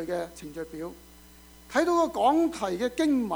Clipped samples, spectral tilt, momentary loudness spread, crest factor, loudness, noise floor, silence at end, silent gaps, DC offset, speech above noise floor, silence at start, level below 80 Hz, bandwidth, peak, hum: under 0.1%; -4.5 dB/octave; 15 LU; 16 dB; -26 LUFS; -52 dBFS; 0 s; none; under 0.1%; 25 dB; 0 s; -56 dBFS; over 20 kHz; -10 dBFS; none